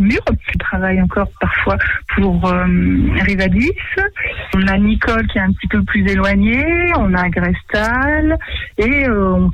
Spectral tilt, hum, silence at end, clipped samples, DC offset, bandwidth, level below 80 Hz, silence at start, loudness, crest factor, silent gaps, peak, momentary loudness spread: -7.5 dB/octave; none; 0 s; under 0.1%; under 0.1%; 8.2 kHz; -24 dBFS; 0 s; -15 LUFS; 10 dB; none; -4 dBFS; 4 LU